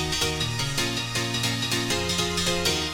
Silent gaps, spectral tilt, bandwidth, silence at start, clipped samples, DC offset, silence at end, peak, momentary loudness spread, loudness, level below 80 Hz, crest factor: none; -3 dB/octave; 17 kHz; 0 s; under 0.1%; under 0.1%; 0 s; -10 dBFS; 3 LU; -24 LUFS; -42 dBFS; 16 dB